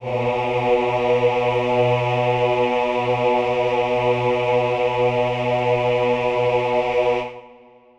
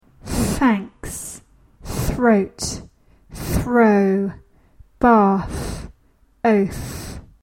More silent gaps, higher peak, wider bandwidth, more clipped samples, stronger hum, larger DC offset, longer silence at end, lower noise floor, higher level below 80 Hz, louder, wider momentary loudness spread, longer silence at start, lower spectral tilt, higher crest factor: neither; second, -6 dBFS vs -2 dBFS; second, 8.2 kHz vs 16.5 kHz; neither; neither; neither; first, 0.45 s vs 0.2 s; second, -48 dBFS vs -57 dBFS; second, -50 dBFS vs -36 dBFS; about the same, -20 LUFS vs -19 LUFS; second, 2 LU vs 18 LU; second, 0 s vs 0.25 s; about the same, -6.5 dB/octave vs -6 dB/octave; second, 12 dB vs 18 dB